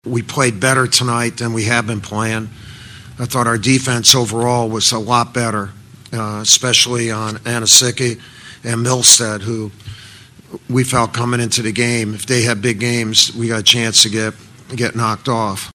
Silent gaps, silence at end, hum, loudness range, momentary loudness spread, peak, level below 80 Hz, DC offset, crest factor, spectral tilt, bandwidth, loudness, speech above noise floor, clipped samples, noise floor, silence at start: none; 0.05 s; none; 4 LU; 15 LU; 0 dBFS; -50 dBFS; under 0.1%; 16 dB; -2.5 dB/octave; over 20 kHz; -14 LUFS; 24 dB; 0.2%; -40 dBFS; 0.05 s